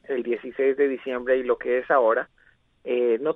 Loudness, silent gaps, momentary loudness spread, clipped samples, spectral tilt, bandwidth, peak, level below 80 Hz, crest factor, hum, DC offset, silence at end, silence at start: -24 LUFS; none; 9 LU; under 0.1%; -7.5 dB/octave; 3.9 kHz; -8 dBFS; -62 dBFS; 16 dB; none; under 0.1%; 0 s; 0.1 s